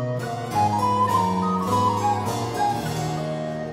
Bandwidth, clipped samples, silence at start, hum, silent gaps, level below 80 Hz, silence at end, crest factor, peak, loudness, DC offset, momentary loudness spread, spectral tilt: 16 kHz; under 0.1%; 0 s; none; none; -52 dBFS; 0 s; 14 dB; -10 dBFS; -23 LUFS; under 0.1%; 7 LU; -6 dB/octave